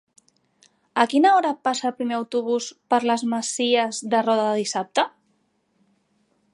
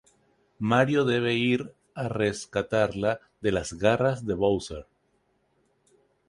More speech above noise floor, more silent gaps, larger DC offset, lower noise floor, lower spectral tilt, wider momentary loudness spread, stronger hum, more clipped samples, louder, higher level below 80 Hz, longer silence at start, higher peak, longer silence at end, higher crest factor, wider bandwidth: about the same, 46 dB vs 45 dB; neither; neither; about the same, -68 dBFS vs -70 dBFS; second, -3 dB/octave vs -5.5 dB/octave; about the same, 8 LU vs 10 LU; neither; neither; first, -22 LUFS vs -26 LUFS; second, -80 dBFS vs -52 dBFS; first, 0.95 s vs 0.6 s; first, -2 dBFS vs -8 dBFS; about the same, 1.45 s vs 1.45 s; about the same, 22 dB vs 20 dB; about the same, 11.5 kHz vs 11.5 kHz